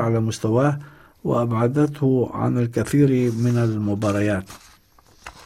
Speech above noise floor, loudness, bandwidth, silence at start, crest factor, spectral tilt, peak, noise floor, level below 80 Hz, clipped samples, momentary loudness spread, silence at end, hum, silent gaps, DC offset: 33 dB; -21 LUFS; 14 kHz; 0 s; 14 dB; -7.5 dB/octave; -6 dBFS; -53 dBFS; -52 dBFS; under 0.1%; 6 LU; 0.05 s; none; none; under 0.1%